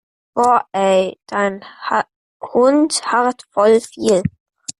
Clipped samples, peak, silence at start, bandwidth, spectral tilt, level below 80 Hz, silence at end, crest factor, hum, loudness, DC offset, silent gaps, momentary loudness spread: under 0.1%; -2 dBFS; 0.35 s; 12.5 kHz; -4.5 dB/octave; -56 dBFS; 0.1 s; 14 dB; none; -17 LUFS; under 0.1%; 2.16-2.40 s, 4.40-4.46 s; 13 LU